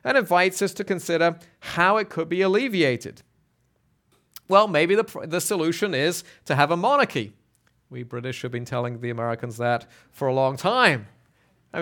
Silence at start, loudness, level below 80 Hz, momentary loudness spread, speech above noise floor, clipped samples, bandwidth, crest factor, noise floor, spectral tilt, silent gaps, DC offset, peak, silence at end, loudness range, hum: 0.05 s; -23 LUFS; -68 dBFS; 13 LU; 44 dB; under 0.1%; 19 kHz; 22 dB; -67 dBFS; -4.5 dB/octave; none; under 0.1%; -2 dBFS; 0 s; 5 LU; none